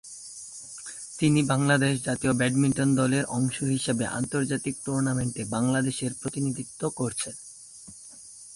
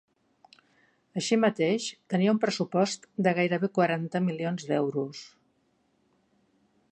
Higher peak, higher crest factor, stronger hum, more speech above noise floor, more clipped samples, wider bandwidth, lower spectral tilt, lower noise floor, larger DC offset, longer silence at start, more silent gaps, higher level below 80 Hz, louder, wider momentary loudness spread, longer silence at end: about the same, -10 dBFS vs -10 dBFS; about the same, 16 dB vs 18 dB; neither; second, 21 dB vs 44 dB; neither; first, 11.5 kHz vs 9.6 kHz; about the same, -5 dB/octave vs -5.5 dB/octave; second, -47 dBFS vs -71 dBFS; neither; second, 0.05 s vs 1.15 s; neither; first, -58 dBFS vs -76 dBFS; about the same, -26 LUFS vs -28 LUFS; first, 18 LU vs 8 LU; second, 0 s vs 1.65 s